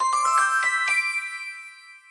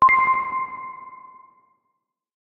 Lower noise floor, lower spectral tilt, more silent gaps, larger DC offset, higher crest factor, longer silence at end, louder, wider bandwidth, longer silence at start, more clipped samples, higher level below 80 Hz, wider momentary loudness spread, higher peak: second, -45 dBFS vs -77 dBFS; second, 3 dB/octave vs -5 dB/octave; neither; neither; about the same, 14 dB vs 16 dB; second, 0.1 s vs 1.25 s; about the same, -21 LUFS vs -20 LUFS; first, 11.5 kHz vs 4.7 kHz; about the same, 0 s vs 0 s; neither; second, -76 dBFS vs -60 dBFS; second, 17 LU vs 23 LU; second, -10 dBFS vs -6 dBFS